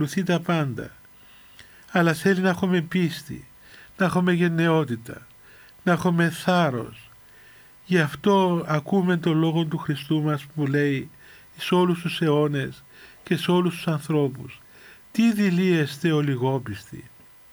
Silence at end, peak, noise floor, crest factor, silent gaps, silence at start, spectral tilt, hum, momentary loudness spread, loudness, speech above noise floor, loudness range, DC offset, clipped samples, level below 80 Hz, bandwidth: 0.45 s; -8 dBFS; -50 dBFS; 16 dB; none; 0 s; -6.5 dB/octave; none; 16 LU; -23 LUFS; 27 dB; 2 LU; under 0.1%; under 0.1%; -62 dBFS; over 20 kHz